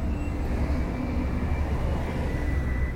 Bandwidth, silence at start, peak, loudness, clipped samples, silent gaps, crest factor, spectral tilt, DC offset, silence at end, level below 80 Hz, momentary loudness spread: 10.5 kHz; 0 s; -14 dBFS; -29 LUFS; under 0.1%; none; 12 dB; -8 dB/octave; under 0.1%; 0 s; -28 dBFS; 2 LU